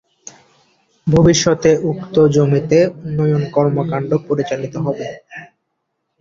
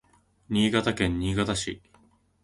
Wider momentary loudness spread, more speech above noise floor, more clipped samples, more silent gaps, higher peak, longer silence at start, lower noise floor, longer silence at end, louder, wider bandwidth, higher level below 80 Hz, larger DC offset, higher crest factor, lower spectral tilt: first, 13 LU vs 9 LU; first, 57 dB vs 36 dB; neither; neither; first, -2 dBFS vs -8 dBFS; first, 1.05 s vs 0.5 s; first, -72 dBFS vs -62 dBFS; about the same, 0.75 s vs 0.65 s; first, -16 LUFS vs -26 LUFS; second, 7.6 kHz vs 11.5 kHz; about the same, -44 dBFS vs -44 dBFS; neither; about the same, 16 dB vs 20 dB; about the same, -6 dB/octave vs -5 dB/octave